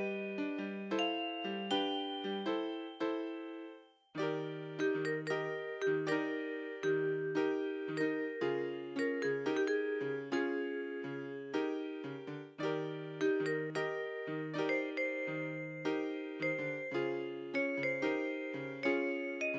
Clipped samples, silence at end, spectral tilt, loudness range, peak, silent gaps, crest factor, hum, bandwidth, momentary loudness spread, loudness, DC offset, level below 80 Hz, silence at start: under 0.1%; 0 s; -5.5 dB/octave; 3 LU; -22 dBFS; none; 16 dB; none; 7.8 kHz; 7 LU; -37 LUFS; under 0.1%; -90 dBFS; 0 s